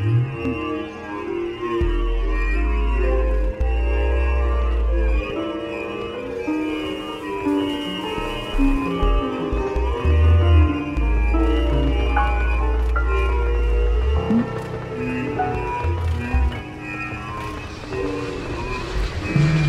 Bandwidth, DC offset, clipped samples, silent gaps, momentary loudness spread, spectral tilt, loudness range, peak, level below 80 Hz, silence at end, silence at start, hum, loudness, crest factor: 8.4 kHz; under 0.1%; under 0.1%; none; 8 LU; -7.5 dB/octave; 6 LU; -6 dBFS; -22 dBFS; 0 s; 0 s; none; -23 LUFS; 14 dB